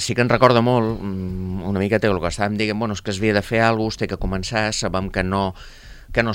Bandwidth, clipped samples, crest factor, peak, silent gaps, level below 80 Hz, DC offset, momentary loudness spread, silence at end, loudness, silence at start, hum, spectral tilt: 16 kHz; under 0.1%; 20 dB; 0 dBFS; none; -38 dBFS; under 0.1%; 11 LU; 0 s; -20 LUFS; 0 s; none; -5.5 dB/octave